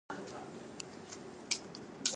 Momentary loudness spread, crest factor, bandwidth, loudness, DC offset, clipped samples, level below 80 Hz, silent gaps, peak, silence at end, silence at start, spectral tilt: 10 LU; 26 dB; 11.5 kHz; -43 LUFS; under 0.1%; under 0.1%; -74 dBFS; none; -18 dBFS; 0 s; 0.1 s; -1.5 dB/octave